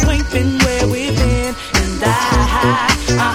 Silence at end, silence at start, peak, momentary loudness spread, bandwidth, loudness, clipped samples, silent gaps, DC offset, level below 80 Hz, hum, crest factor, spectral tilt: 0 s; 0 s; 0 dBFS; 3 LU; 16.5 kHz; -15 LUFS; under 0.1%; none; under 0.1%; -22 dBFS; none; 14 dB; -4.5 dB/octave